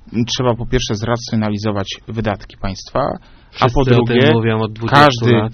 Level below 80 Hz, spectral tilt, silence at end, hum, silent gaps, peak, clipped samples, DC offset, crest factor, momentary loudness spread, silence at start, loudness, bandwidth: -32 dBFS; -5 dB/octave; 0 s; none; none; 0 dBFS; 0.1%; under 0.1%; 16 dB; 13 LU; 0.1 s; -16 LUFS; 6.8 kHz